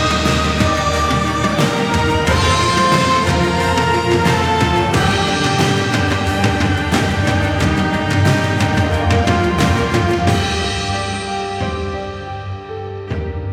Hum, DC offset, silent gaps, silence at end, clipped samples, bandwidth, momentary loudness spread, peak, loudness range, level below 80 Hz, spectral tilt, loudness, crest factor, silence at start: none; under 0.1%; none; 0 s; under 0.1%; 16 kHz; 10 LU; -2 dBFS; 4 LU; -30 dBFS; -5 dB/octave; -16 LUFS; 14 dB; 0 s